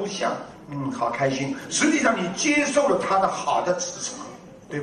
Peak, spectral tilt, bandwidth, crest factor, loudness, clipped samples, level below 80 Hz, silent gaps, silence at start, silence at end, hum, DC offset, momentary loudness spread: -6 dBFS; -3.5 dB/octave; 11 kHz; 18 dB; -23 LUFS; under 0.1%; -60 dBFS; none; 0 s; 0 s; none; under 0.1%; 14 LU